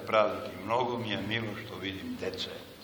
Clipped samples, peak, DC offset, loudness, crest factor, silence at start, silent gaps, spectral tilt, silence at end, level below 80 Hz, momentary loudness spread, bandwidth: under 0.1%; -10 dBFS; under 0.1%; -33 LUFS; 22 dB; 0 s; none; -5.5 dB/octave; 0 s; -64 dBFS; 10 LU; over 20 kHz